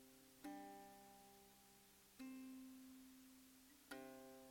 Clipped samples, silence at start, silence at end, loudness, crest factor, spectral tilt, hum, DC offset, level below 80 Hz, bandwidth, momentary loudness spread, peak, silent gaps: under 0.1%; 0 s; 0 s; -61 LUFS; 20 dB; -3.5 dB/octave; none; under 0.1%; -84 dBFS; 17 kHz; 10 LU; -42 dBFS; none